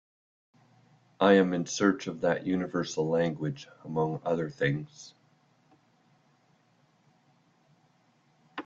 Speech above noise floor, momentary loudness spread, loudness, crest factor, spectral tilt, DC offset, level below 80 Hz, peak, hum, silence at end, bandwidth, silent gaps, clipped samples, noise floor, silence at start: 39 dB; 19 LU; -28 LUFS; 24 dB; -5.5 dB/octave; under 0.1%; -68 dBFS; -8 dBFS; none; 0.05 s; 7.8 kHz; none; under 0.1%; -67 dBFS; 1.2 s